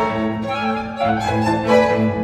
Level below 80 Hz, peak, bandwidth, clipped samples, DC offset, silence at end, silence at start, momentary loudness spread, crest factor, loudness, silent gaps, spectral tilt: -44 dBFS; -2 dBFS; 12.5 kHz; under 0.1%; under 0.1%; 0 s; 0 s; 7 LU; 16 dB; -18 LUFS; none; -6.5 dB/octave